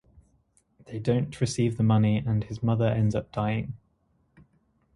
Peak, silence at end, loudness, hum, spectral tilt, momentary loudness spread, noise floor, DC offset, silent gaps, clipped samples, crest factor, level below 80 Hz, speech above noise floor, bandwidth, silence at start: -12 dBFS; 1.2 s; -26 LUFS; none; -7.5 dB/octave; 9 LU; -69 dBFS; under 0.1%; none; under 0.1%; 16 dB; -52 dBFS; 44 dB; 11.5 kHz; 0.9 s